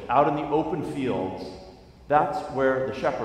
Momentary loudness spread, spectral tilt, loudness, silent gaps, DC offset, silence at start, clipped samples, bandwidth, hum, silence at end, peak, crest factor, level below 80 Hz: 12 LU; -7 dB/octave; -25 LUFS; none; under 0.1%; 0 s; under 0.1%; 12 kHz; none; 0 s; -6 dBFS; 20 dB; -52 dBFS